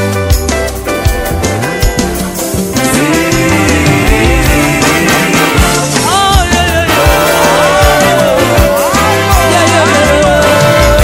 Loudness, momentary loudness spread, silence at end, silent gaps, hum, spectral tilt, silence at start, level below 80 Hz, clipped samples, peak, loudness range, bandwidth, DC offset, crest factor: -8 LUFS; 6 LU; 0 s; none; none; -4 dB/octave; 0 s; -18 dBFS; 1%; 0 dBFS; 4 LU; over 20 kHz; 0.1%; 8 dB